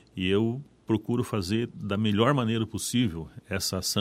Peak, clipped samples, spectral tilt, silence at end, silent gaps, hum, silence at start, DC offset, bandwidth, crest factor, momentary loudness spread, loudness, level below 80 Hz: -8 dBFS; under 0.1%; -5 dB/octave; 0 s; none; none; 0.15 s; under 0.1%; 16 kHz; 20 dB; 7 LU; -28 LUFS; -54 dBFS